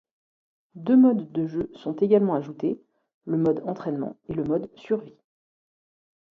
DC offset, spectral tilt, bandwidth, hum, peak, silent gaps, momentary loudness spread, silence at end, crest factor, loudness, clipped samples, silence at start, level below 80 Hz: under 0.1%; -10 dB/octave; 4.4 kHz; none; -8 dBFS; 3.14-3.21 s; 13 LU; 1.3 s; 18 dB; -25 LUFS; under 0.1%; 0.75 s; -62 dBFS